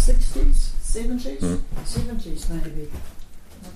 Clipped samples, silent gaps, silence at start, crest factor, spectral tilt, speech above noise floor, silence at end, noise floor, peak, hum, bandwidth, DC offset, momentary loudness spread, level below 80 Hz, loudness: under 0.1%; none; 0 s; 12 dB; -5.5 dB/octave; 18 dB; 0 s; -37 dBFS; -6 dBFS; none; 12 kHz; under 0.1%; 18 LU; -20 dBFS; -28 LUFS